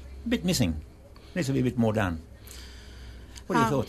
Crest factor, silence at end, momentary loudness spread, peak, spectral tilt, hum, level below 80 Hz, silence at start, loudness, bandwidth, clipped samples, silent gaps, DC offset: 18 dB; 0 s; 20 LU; -10 dBFS; -5.5 dB/octave; none; -44 dBFS; 0 s; -28 LUFS; 13.5 kHz; under 0.1%; none; under 0.1%